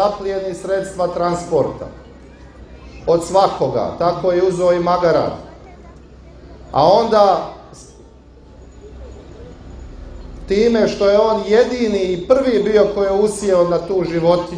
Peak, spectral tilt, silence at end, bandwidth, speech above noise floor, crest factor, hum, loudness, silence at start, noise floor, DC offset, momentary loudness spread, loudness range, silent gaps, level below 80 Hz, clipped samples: 0 dBFS; -6 dB/octave; 0 s; 10.5 kHz; 27 dB; 18 dB; none; -16 LUFS; 0 s; -42 dBFS; under 0.1%; 23 LU; 6 LU; none; -40 dBFS; under 0.1%